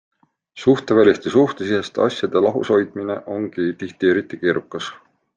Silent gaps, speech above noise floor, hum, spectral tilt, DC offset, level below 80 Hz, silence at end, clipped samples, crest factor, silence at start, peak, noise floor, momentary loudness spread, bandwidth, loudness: none; 25 dB; none; -6 dB/octave; under 0.1%; -62 dBFS; 0.4 s; under 0.1%; 18 dB; 0.55 s; -2 dBFS; -43 dBFS; 11 LU; 9 kHz; -19 LUFS